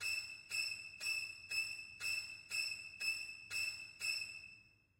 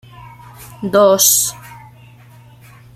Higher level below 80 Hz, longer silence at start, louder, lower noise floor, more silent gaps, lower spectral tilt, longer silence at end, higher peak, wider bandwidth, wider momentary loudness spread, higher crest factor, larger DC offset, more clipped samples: second, -78 dBFS vs -52 dBFS; second, 0 s vs 0.2 s; second, -41 LUFS vs -12 LUFS; first, -65 dBFS vs -42 dBFS; neither; second, 1.5 dB/octave vs -2.5 dB/octave; second, 0.3 s vs 1.2 s; second, -28 dBFS vs 0 dBFS; about the same, 16 kHz vs 16 kHz; second, 4 LU vs 18 LU; about the same, 16 dB vs 18 dB; neither; neither